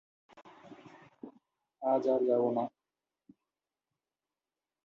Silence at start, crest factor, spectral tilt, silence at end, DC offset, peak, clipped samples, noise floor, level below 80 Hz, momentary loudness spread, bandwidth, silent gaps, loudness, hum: 0.35 s; 20 dB; -8.5 dB/octave; 2.15 s; under 0.1%; -18 dBFS; under 0.1%; under -90 dBFS; -84 dBFS; 25 LU; 6.8 kHz; none; -31 LUFS; none